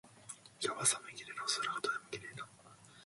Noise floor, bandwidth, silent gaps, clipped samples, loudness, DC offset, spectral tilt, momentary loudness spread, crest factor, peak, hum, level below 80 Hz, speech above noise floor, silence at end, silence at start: -60 dBFS; 11.5 kHz; none; under 0.1%; -37 LUFS; under 0.1%; -1 dB/octave; 19 LU; 24 dB; -16 dBFS; none; -80 dBFS; 23 dB; 0 s; 0.05 s